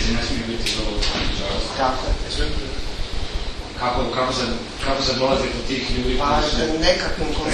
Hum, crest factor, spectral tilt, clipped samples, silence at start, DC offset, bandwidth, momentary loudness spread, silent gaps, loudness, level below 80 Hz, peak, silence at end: none; 18 dB; -4 dB/octave; under 0.1%; 0 s; under 0.1%; 12 kHz; 10 LU; none; -22 LUFS; -28 dBFS; -4 dBFS; 0 s